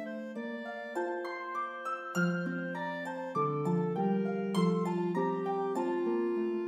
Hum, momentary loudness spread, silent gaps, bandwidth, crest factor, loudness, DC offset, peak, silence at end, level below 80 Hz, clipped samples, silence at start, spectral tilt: none; 8 LU; none; 12 kHz; 16 dB; -33 LUFS; under 0.1%; -18 dBFS; 0 s; -82 dBFS; under 0.1%; 0 s; -7.5 dB/octave